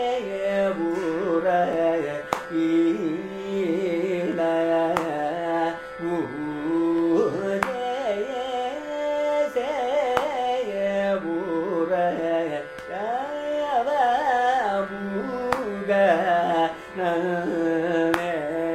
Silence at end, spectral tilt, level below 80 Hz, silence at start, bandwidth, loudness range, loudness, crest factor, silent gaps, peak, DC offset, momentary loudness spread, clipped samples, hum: 0 s; -6 dB/octave; -58 dBFS; 0 s; 14 kHz; 2 LU; -24 LUFS; 22 dB; none; -2 dBFS; under 0.1%; 7 LU; under 0.1%; none